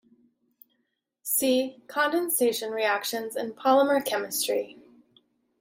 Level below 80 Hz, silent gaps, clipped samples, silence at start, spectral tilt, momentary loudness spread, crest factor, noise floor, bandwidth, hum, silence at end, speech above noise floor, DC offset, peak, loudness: -78 dBFS; none; under 0.1%; 1.25 s; -1.5 dB/octave; 10 LU; 20 dB; -77 dBFS; 16.5 kHz; none; 0.9 s; 51 dB; under 0.1%; -8 dBFS; -26 LUFS